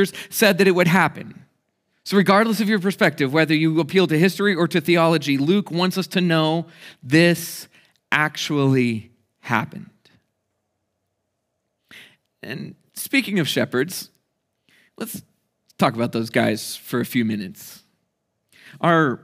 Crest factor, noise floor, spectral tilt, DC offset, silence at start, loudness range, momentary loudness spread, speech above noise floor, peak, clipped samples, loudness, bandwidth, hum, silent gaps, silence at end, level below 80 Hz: 20 dB; -76 dBFS; -5.5 dB/octave; under 0.1%; 0 s; 10 LU; 18 LU; 56 dB; -2 dBFS; under 0.1%; -19 LUFS; 16 kHz; none; none; 0.05 s; -72 dBFS